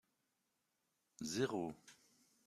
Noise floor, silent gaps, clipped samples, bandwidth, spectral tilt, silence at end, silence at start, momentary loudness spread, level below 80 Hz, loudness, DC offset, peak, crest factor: -86 dBFS; none; under 0.1%; 15 kHz; -4.5 dB/octave; 0.55 s; 1.2 s; 21 LU; -80 dBFS; -43 LUFS; under 0.1%; -24 dBFS; 22 dB